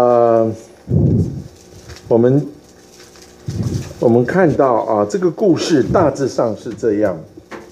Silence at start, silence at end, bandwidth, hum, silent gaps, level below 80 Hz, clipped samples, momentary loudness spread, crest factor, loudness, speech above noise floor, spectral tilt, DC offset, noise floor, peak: 0 s; 0.1 s; 13 kHz; none; none; -40 dBFS; under 0.1%; 17 LU; 16 dB; -16 LUFS; 28 dB; -7.5 dB/octave; under 0.1%; -42 dBFS; 0 dBFS